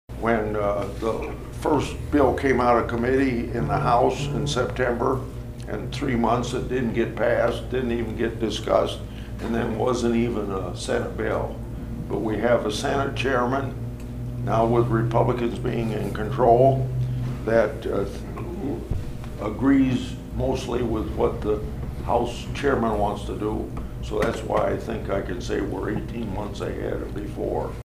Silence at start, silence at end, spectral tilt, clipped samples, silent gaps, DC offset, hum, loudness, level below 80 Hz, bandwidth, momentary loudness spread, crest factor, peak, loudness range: 0.1 s; 0.1 s; -6.5 dB/octave; under 0.1%; none; under 0.1%; none; -24 LUFS; -36 dBFS; 15.5 kHz; 11 LU; 20 dB; -4 dBFS; 4 LU